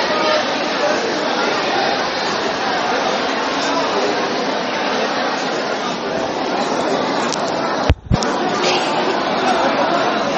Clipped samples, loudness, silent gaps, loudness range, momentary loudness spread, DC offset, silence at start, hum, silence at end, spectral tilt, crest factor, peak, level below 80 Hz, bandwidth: under 0.1%; -18 LUFS; none; 2 LU; 4 LU; under 0.1%; 0 s; none; 0 s; -4 dB/octave; 18 dB; 0 dBFS; -36 dBFS; 8.2 kHz